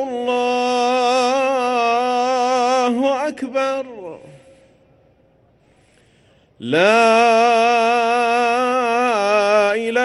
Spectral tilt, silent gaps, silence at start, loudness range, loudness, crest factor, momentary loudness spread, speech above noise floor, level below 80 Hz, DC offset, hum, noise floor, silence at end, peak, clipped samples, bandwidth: -3.5 dB/octave; none; 0 s; 12 LU; -16 LUFS; 14 dB; 9 LU; 40 dB; -64 dBFS; under 0.1%; none; -56 dBFS; 0 s; -4 dBFS; under 0.1%; 12 kHz